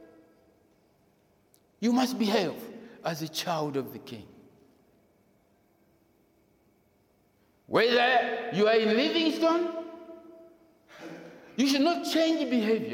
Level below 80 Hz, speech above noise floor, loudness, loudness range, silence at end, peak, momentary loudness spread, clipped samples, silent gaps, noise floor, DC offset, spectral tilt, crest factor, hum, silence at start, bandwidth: -76 dBFS; 41 dB; -27 LUFS; 11 LU; 0 s; -10 dBFS; 22 LU; under 0.1%; none; -67 dBFS; under 0.1%; -4.5 dB/octave; 20 dB; none; 0 s; 17.5 kHz